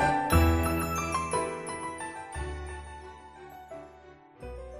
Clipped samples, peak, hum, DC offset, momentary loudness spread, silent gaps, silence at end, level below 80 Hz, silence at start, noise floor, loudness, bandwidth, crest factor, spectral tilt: under 0.1%; -10 dBFS; none; under 0.1%; 23 LU; none; 0 s; -36 dBFS; 0 s; -53 dBFS; -30 LUFS; 14.5 kHz; 22 dB; -5.5 dB/octave